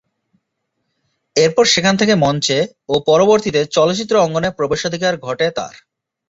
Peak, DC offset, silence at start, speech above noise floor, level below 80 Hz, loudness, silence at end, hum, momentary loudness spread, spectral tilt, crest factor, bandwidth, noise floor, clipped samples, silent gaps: -2 dBFS; under 0.1%; 1.35 s; 58 dB; -52 dBFS; -15 LUFS; 0.6 s; none; 7 LU; -4 dB/octave; 16 dB; 8 kHz; -73 dBFS; under 0.1%; none